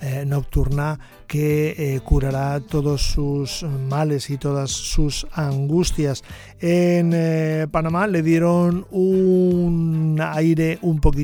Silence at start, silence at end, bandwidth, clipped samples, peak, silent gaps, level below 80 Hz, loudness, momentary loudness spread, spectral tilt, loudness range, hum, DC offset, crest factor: 0 s; 0 s; 17.5 kHz; under 0.1%; -2 dBFS; none; -28 dBFS; -20 LUFS; 7 LU; -6.5 dB/octave; 4 LU; none; under 0.1%; 16 dB